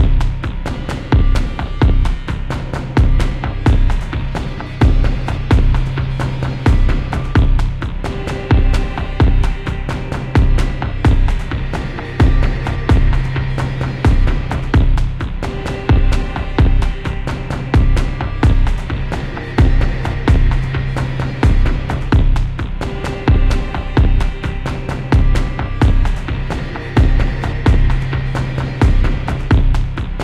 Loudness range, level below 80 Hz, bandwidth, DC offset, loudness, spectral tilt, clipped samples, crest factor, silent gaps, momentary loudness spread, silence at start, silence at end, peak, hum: 1 LU; -16 dBFS; 9.2 kHz; 0.4%; -17 LUFS; -7.5 dB/octave; under 0.1%; 14 dB; none; 8 LU; 0 s; 0 s; 0 dBFS; none